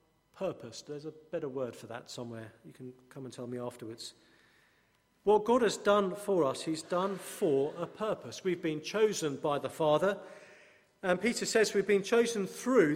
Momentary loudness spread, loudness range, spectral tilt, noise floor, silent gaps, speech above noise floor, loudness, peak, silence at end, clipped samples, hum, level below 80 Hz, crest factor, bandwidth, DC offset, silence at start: 18 LU; 12 LU; -4.5 dB/octave; -71 dBFS; none; 39 dB; -32 LUFS; -14 dBFS; 0 s; under 0.1%; none; -74 dBFS; 20 dB; 16 kHz; under 0.1%; 0.35 s